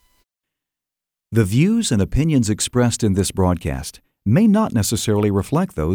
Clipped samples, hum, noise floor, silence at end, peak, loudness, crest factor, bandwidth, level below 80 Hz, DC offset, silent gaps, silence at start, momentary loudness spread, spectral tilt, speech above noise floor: under 0.1%; none; -86 dBFS; 0 s; -4 dBFS; -18 LUFS; 14 dB; 19.5 kHz; -36 dBFS; under 0.1%; none; 1.3 s; 8 LU; -6 dB/octave; 69 dB